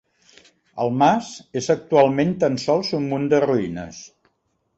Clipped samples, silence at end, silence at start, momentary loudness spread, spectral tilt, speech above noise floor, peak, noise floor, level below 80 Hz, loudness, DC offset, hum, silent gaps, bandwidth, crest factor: under 0.1%; 0.7 s; 0.75 s; 14 LU; -6 dB/octave; 49 dB; -4 dBFS; -69 dBFS; -56 dBFS; -20 LUFS; under 0.1%; none; none; 8.2 kHz; 18 dB